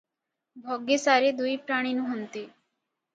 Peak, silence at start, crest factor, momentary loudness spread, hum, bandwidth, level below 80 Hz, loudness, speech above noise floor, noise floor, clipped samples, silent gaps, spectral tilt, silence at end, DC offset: -8 dBFS; 0.55 s; 20 dB; 18 LU; none; 9.2 kHz; -80 dBFS; -26 LUFS; 59 dB; -85 dBFS; under 0.1%; none; -2.5 dB/octave; 0.65 s; under 0.1%